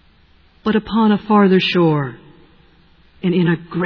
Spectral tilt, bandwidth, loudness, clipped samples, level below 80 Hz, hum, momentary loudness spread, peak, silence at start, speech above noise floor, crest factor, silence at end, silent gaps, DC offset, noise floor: -8.5 dB/octave; 5.4 kHz; -16 LUFS; under 0.1%; -50 dBFS; none; 10 LU; -2 dBFS; 0.65 s; 36 dB; 14 dB; 0 s; none; under 0.1%; -51 dBFS